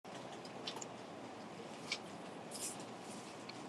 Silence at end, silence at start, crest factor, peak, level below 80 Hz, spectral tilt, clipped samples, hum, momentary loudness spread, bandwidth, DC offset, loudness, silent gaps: 0 s; 0.05 s; 24 dB; -24 dBFS; -88 dBFS; -2.5 dB/octave; under 0.1%; none; 6 LU; 13 kHz; under 0.1%; -47 LUFS; none